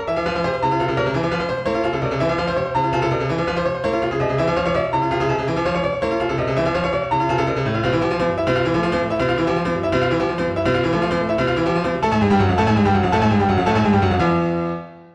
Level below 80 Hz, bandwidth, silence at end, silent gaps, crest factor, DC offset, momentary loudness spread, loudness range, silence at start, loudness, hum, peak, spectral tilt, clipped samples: -38 dBFS; 10 kHz; 0.1 s; none; 12 dB; under 0.1%; 5 LU; 3 LU; 0 s; -19 LUFS; none; -6 dBFS; -7 dB/octave; under 0.1%